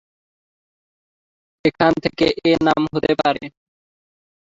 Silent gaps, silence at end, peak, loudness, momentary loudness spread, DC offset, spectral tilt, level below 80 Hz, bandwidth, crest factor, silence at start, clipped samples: none; 1 s; -2 dBFS; -18 LUFS; 6 LU; under 0.1%; -6.5 dB/octave; -52 dBFS; 7.8 kHz; 20 dB; 1.65 s; under 0.1%